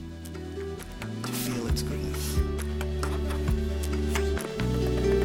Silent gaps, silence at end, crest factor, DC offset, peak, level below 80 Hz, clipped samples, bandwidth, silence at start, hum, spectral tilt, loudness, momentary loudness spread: none; 0 s; 16 dB; under 0.1%; -12 dBFS; -34 dBFS; under 0.1%; 17 kHz; 0 s; none; -5.5 dB/octave; -30 LUFS; 9 LU